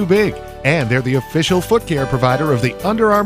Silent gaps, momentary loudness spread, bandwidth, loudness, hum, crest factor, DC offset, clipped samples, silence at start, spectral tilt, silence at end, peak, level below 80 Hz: none; 3 LU; 16 kHz; -16 LUFS; none; 16 dB; under 0.1%; under 0.1%; 0 s; -6 dB/octave; 0 s; 0 dBFS; -38 dBFS